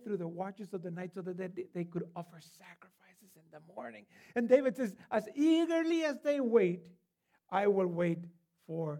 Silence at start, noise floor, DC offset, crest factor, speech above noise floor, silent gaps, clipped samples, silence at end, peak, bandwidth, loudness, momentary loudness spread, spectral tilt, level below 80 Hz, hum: 0 s; -78 dBFS; under 0.1%; 22 dB; 44 dB; none; under 0.1%; 0 s; -14 dBFS; 13.5 kHz; -33 LUFS; 19 LU; -7 dB/octave; -86 dBFS; none